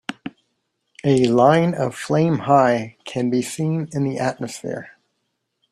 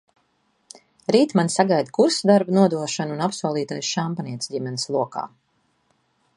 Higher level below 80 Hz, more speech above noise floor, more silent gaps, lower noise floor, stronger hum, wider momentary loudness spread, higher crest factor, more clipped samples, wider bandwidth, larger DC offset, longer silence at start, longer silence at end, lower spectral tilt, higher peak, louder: first, -60 dBFS vs -70 dBFS; first, 55 dB vs 46 dB; neither; first, -74 dBFS vs -67 dBFS; neither; first, 16 LU vs 11 LU; about the same, 18 dB vs 20 dB; neither; first, 13 kHz vs 11.5 kHz; neither; second, 0.1 s vs 1.1 s; second, 0.85 s vs 1.1 s; first, -6.5 dB/octave vs -5 dB/octave; about the same, -2 dBFS vs -2 dBFS; about the same, -19 LUFS vs -21 LUFS